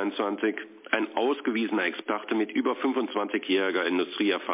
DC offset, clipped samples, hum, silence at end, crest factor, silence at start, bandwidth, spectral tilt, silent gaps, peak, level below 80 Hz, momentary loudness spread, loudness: under 0.1%; under 0.1%; none; 0 s; 18 dB; 0 s; 3.9 kHz; -1.5 dB/octave; none; -8 dBFS; -88 dBFS; 4 LU; -27 LUFS